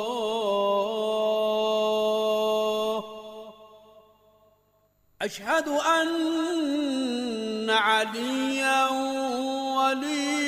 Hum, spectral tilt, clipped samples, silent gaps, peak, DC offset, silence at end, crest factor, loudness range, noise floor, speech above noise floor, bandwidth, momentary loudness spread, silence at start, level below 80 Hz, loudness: none; -3 dB/octave; under 0.1%; none; -12 dBFS; under 0.1%; 0 s; 16 dB; 6 LU; -66 dBFS; 41 dB; 15.5 kHz; 8 LU; 0 s; -70 dBFS; -26 LUFS